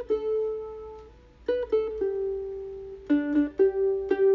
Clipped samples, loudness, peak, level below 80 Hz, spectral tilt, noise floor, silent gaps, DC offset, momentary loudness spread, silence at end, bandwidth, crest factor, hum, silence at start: under 0.1%; -27 LUFS; -12 dBFS; -54 dBFS; -8 dB/octave; -50 dBFS; none; under 0.1%; 16 LU; 0 s; 4.8 kHz; 16 dB; none; 0 s